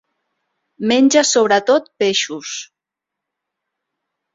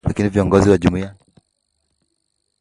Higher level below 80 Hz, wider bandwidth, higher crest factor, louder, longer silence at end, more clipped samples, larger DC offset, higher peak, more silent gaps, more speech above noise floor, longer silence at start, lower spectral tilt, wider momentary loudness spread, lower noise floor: second, -64 dBFS vs -36 dBFS; second, 7.8 kHz vs 11.5 kHz; about the same, 18 dB vs 18 dB; about the same, -15 LUFS vs -16 LUFS; first, 1.7 s vs 1.5 s; neither; neither; about the same, -2 dBFS vs 0 dBFS; neither; first, 68 dB vs 55 dB; first, 0.8 s vs 0.05 s; second, -2.5 dB/octave vs -7.5 dB/octave; about the same, 14 LU vs 13 LU; first, -83 dBFS vs -71 dBFS